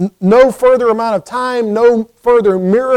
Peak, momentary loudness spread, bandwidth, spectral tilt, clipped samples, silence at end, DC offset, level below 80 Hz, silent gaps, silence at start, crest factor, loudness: 0 dBFS; 7 LU; 12.5 kHz; -7 dB/octave; under 0.1%; 0 s; under 0.1%; -46 dBFS; none; 0 s; 12 dB; -12 LUFS